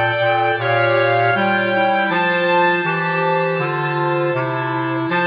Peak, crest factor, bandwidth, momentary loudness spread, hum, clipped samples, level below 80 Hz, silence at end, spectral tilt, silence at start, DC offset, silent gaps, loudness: -6 dBFS; 12 dB; 5.2 kHz; 5 LU; none; under 0.1%; -68 dBFS; 0 s; -8.5 dB/octave; 0 s; under 0.1%; none; -17 LUFS